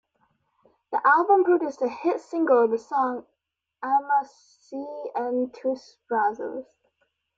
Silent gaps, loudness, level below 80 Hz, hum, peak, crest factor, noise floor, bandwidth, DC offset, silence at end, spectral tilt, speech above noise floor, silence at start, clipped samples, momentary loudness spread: none; -24 LUFS; -78 dBFS; none; -8 dBFS; 18 dB; -73 dBFS; 7.6 kHz; under 0.1%; 0.75 s; -5.5 dB/octave; 49 dB; 0.9 s; under 0.1%; 16 LU